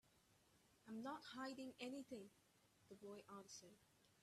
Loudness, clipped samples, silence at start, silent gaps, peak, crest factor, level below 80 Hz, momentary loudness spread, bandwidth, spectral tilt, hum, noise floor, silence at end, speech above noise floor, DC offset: -56 LUFS; under 0.1%; 0.05 s; none; -38 dBFS; 20 dB; under -90 dBFS; 11 LU; 14 kHz; -3.5 dB/octave; none; -78 dBFS; 0 s; 22 dB; under 0.1%